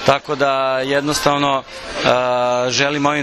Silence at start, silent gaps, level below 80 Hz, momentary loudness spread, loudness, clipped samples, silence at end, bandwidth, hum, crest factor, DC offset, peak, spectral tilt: 0 s; none; -46 dBFS; 3 LU; -17 LUFS; under 0.1%; 0 s; 13 kHz; none; 16 dB; under 0.1%; 0 dBFS; -3.5 dB/octave